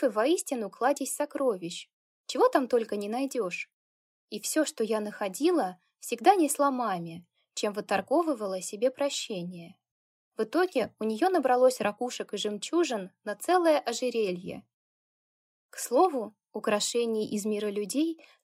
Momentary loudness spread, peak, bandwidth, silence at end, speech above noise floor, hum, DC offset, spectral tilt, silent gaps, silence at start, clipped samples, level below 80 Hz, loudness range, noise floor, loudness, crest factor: 14 LU; -8 dBFS; 16 kHz; 0.3 s; over 62 dB; none; under 0.1%; -3.5 dB/octave; 1.93-2.24 s, 3.73-4.28 s, 9.91-10.31 s, 14.74-15.69 s; 0 s; under 0.1%; -82 dBFS; 3 LU; under -90 dBFS; -29 LUFS; 22 dB